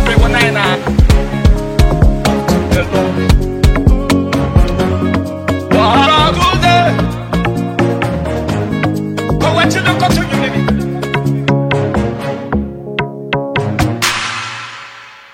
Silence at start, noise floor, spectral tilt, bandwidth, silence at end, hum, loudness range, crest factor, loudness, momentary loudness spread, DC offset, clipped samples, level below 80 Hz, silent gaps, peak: 0 s; -34 dBFS; -5.5 dB/octave; 16.5 kHz; 0.15 s; none; 4 LU; 12 dB; -13 LUFS; 9 LU; under 0.1%; under 0.1%; -18 dBFS; none; 0 dBFS